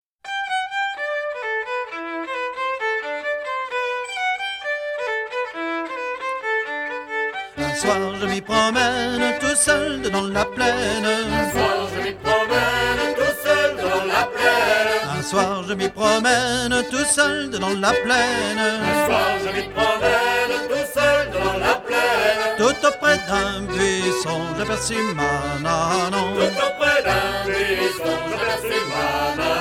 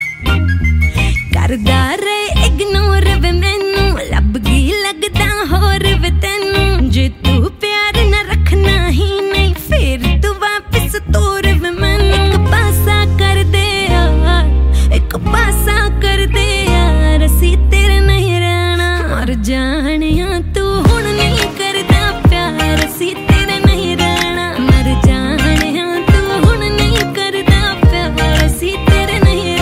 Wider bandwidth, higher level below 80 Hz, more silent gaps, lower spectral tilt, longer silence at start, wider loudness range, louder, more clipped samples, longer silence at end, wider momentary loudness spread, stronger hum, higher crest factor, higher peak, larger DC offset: first, 18 kHz vs 16 kHz; second, -44 dBFS vs -14 dBFS; neither; second, -3 dB/octave vs -5 dB/octave; first, 0.25 s vs 0 s; first, 6 LU vs 2 LU; second, -20 LUFS vs -12 LUFS; neither; about the same, 0 s vs 0 s; first, 8 LU vs 4 LU; neither; first, 18 dB vs 12 dB; about the same, -2 dBFS vs 0 dBFS; neither